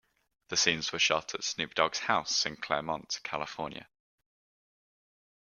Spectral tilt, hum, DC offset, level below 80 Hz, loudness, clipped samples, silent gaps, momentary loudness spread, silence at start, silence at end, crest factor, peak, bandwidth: -1 dB/octave; none; under 0.1%; -68 dBFS; -30 LUFS; under 0.1%; none; 10 LU; 0.5 s; 1.65 s; 26 dB; -8 dBFS; 13.5 kHz